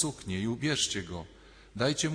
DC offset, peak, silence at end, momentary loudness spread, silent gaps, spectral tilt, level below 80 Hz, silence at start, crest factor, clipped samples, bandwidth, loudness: under 0.1%; -14 dBFS; 0 s; 16 LU; none; -3.5 dB/octave; -58 dBFS; 0 s; 18 dB; under 0.1%; 14 kHz; -31 LUFS